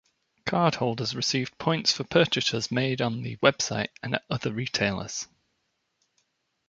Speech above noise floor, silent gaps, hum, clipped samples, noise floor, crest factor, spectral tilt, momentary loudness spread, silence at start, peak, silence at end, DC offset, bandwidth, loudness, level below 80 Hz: 49 dB; none; none; under 0.1%; -76 dBFS; 26 dB; -4 dB/octave; 8 LU; 0.45 s; -2 dBFS; 1.45 s; under 0.1%; 9.4 kHz; -26 LUFS; -60 dBFS